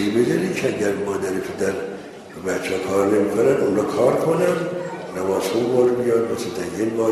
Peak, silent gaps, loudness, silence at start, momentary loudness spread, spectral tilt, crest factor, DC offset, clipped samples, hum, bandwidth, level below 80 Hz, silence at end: -4 dBFS; none; -21 LUFS; 0 s; 9 LU; -5.5 dB/octave; 16 dB; under 0.1%; under 0.1%; none; 13.5 kHz; -58 dBFS; 0 s